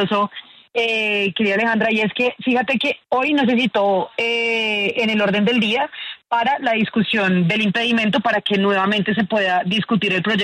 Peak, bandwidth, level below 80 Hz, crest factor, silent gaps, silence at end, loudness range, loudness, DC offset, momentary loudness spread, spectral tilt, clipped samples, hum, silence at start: -6 dBFS; 10.5 kHz; -62 dBFS; 14 dB; none; 0 s; 1 LU; -18 LUFS; under 0.1%; 3 LU; -6 dB/octave; under 0.1%; none; 0 s